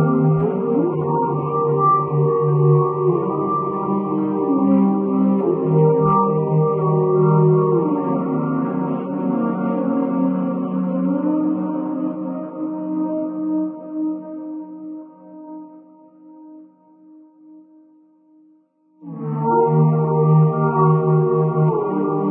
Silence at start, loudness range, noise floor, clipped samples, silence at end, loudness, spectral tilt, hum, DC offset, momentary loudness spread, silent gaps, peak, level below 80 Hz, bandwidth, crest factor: 0 s; 11 LU; -57 dBFS; under 0.1%; 0 s; -19 LUFS; -15 dB/octave; none; under 0.1%; 12 LU; none; -4 dBFS; -60 dBFS; 3 kHz; 14 dB